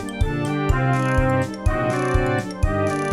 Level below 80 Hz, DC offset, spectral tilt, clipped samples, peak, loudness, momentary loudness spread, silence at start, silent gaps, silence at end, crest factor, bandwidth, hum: -28 dBFS; under 0.1%; -7 dB/octave; under 0.1%; -6 dBFS; -21 LUFS; 4 LU; 0 s; none; 0 s; 16 dB; 13 kHz; none